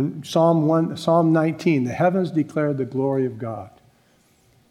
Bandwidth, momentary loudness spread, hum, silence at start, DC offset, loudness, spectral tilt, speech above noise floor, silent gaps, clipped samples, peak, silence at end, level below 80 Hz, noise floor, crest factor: 12.5 kHz; 8 LU; none; 0 s; under 0.1%; -21 LUFS; -7.5 dB/octave; 39 dB; none; under 0.1%; -6 dBFS; 1 s; -66 dBFS; -59 dBFS; 16 dB